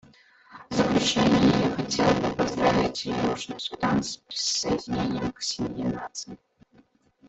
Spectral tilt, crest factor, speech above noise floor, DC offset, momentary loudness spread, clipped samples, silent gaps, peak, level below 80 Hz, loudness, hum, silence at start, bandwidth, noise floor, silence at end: -4.5 dB/octave; 18 dB; 34 dB; under 0.1%; 10 LU; under 0.1%; none; -8 dBFS; -50 dBFS; -25 LUFS; none; 0.5 s; 8.4 kHz; -60 dBFS; 0.95 s